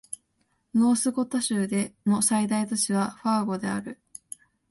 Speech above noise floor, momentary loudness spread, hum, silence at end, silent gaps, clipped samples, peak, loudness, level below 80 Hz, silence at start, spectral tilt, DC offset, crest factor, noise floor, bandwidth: 47 dB; 19 LU; none; 0.75 s; none; under 0.1%; -10 dBFS; -25 LUFS; -66 dBFS; 0.1 s; -4.5 dB/octave; under 0.1%; 16 dB; -72 dBFS; 12 kHz